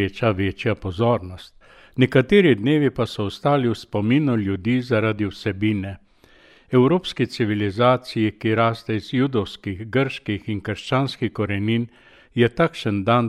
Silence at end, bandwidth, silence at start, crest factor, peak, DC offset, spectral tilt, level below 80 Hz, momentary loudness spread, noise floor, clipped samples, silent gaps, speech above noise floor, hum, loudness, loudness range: 0 s; 12.5 kHz; 0 s; 18 dB; -4 dBFS; under 0.1%; -7.5 dB/octave; -50 dBFS; 10 LU; -53 dBFS; under 0.1%; none; 32 dB; none; -21 LUFS; 4 LU